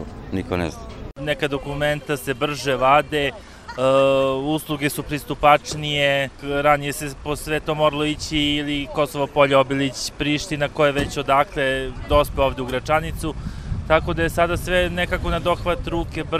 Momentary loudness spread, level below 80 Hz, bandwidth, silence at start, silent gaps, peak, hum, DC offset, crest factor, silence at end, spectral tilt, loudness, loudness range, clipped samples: 11 LU; -36 dBFS; 16 kHz; 0 s; none; 0 dBFS; none; under 0.1%; 20 dB; 0 s; -5 dB/octave; -21 LUFS; 2 LU; under 0.1%